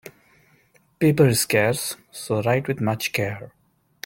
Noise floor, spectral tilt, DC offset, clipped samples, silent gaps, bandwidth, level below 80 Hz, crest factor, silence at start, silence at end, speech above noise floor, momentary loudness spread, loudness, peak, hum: -60 dBFS; -5 dB/octave; under 0.1%; under 0.1%; none; 17 kHz; -58 dBFS; 20 dB; 0.05 s; 0.55 s; 38 dB; 12 LU; -22 LUFS; -4 dBFS; none